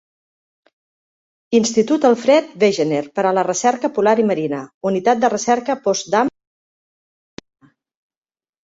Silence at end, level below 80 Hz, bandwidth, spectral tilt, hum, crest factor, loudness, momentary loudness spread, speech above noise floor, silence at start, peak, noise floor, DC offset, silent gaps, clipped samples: 2.35 s; -64 dBFS; 8 kHz; -4.5 dB/octave; none; 18 dB; -17 LUFS; 5 LU; over 74 dB; 1.5 s; -2 dBFS; under -90 dBFS; under 0.1%; 4.74-4.81 s; under 0.1%